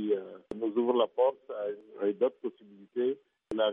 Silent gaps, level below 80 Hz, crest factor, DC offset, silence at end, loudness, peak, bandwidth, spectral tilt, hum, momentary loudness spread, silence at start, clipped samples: none; -72 dBFS; 18 dB; under 0.1%; 0 s; -32 LUFS; -14 dBFS; 3.8 kHz; -3.5 dB/octave; none; 13 LU; 0 s; under 0.1%